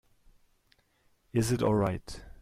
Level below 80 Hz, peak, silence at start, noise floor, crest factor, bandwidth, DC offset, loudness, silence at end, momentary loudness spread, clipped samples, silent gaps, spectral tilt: -52 dBFS; -16 dBFS; 1.35 s; -69 dBFS; 16 dB; 15.5 kHz; under 0.1%; -30 LUFS; 0.1 s; 13 LU; under 0.1%; none; -6.5 dB/octave